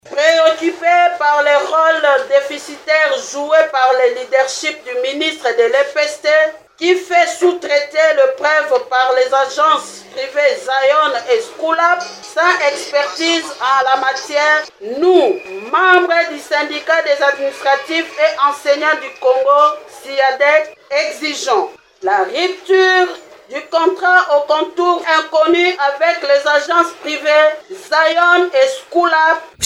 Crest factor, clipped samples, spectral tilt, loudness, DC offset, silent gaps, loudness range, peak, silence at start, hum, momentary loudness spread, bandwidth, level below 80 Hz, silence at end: 14 dB; under 0.1%; -1 dB/octave; -14 LUFS; under 0.1%; none; 2 LU; 0 dBFS; 0.05 s; none; 8 LU; 14 kHz; -66 dBFS; 0 s